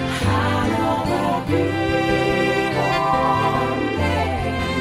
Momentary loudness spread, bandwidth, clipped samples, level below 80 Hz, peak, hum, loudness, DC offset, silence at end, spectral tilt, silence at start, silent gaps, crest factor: 3 LU; 16 kHz; under 0.1%; -38 dBFS; -4 dBFS; none; -20 LUFS; under 0.1%; 0 s; -6 dB/octave; 0 s; none; 14 dB